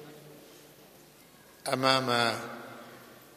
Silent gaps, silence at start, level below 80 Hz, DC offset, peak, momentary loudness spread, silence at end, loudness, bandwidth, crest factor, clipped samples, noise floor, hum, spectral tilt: none; 0 s; -76 dBFS; under 0.1%; -8 dBFS; 25 LU; 0.2 s; -28 LUFS; 15 kHz; 26 dB; under 0.1%; -56 dBFS; none; -3.5 dB/octave